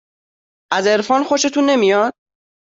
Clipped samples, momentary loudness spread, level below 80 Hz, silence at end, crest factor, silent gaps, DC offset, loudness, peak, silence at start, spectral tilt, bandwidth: under 0.1%; 6 LU; -64 dBFS; 0.55 s; 14 dB; none; under 0.1%; -16 LUFS; -2 dBFS; 0.7 s; -3 dB/octave; 7.8 kHz